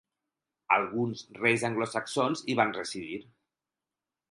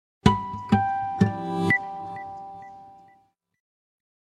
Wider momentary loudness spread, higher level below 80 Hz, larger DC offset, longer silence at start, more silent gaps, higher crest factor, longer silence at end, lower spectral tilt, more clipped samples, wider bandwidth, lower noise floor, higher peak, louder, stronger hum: second, 10 LU vs 18 LU; second, -72 dBFS vs -46 dBFS; neither; first, 0.7 s vs 0.25 s; neither; about the same, 24 dB vs 26 dB; second, 1.1 s vs 1.35 s; second, -4.5 dB/octave vs -7 dB/octave; neither; about the same, 11.5 kHz vs 11.5 kHz; first, under -90 dBFS vs -63 dBFS; second, -8 dBFS vs 0 dBFS; second, -29 LUFS vs -25 LUFS; neither